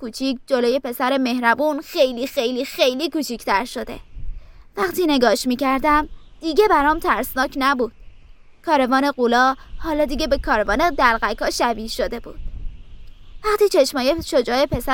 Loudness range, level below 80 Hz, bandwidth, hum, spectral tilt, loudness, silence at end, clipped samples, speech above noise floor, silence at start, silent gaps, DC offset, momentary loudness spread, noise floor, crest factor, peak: 3 LU; -36 dBFS; 17 kHz; none; -3.5 dB/octave; -19 LUFS; 0 s; under 0.1%; 25 dB; 0 s; none; under 0.1%; 14 LU; -44 dBFS; 20 dB; 0 dBFS